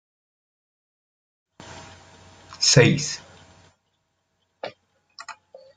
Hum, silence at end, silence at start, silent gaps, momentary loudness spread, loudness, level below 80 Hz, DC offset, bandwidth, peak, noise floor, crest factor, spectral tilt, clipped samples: none; 0.45 s; 1.65 s; none; 27 LU; -18 LUFS; -60 dBFS; under 0.1%; 9.6 kHz; -2 dBFS; -73 dBFS; 26 dB; -3.5 dB/octave; under 0.1%